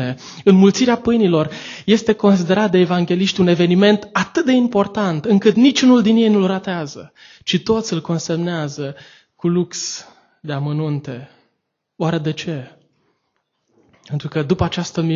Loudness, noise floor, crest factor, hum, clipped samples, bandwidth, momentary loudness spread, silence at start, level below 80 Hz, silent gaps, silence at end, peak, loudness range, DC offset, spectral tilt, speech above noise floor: -17 LUFS; -73 dBFS; 16 dB; none; under 0.1%; 7.6 kHz; 15 LU; 0 s; -48 dBFS; none; 0 s; 0 dBFS; 11 LU; under 0.1%; -6 dB/octave; 57 dB